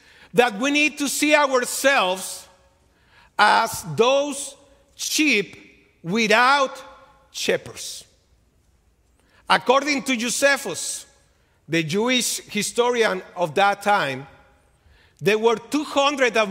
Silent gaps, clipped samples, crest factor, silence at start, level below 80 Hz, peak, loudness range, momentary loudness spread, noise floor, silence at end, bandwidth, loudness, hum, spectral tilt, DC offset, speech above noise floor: none; under 0.1%; 22 dB; 0.35 s; -62 dBFS; 0 dBFS; 3 LU; 15 LU; -61 dBFS; 0 s; 16 kHz; -20 LUFS; none; -2.5 dB/octave; under 0.1%; 40 dB